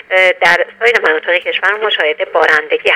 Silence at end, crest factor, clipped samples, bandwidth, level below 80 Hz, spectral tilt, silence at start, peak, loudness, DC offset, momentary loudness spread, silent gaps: 0 s; 12 dB; 0.2%; 15.5 kHz; -56 dBFS; -2 dB/octave; 0.1 s; 0 dBFS; -11 LUFS; under 0.1%; 4 LU; none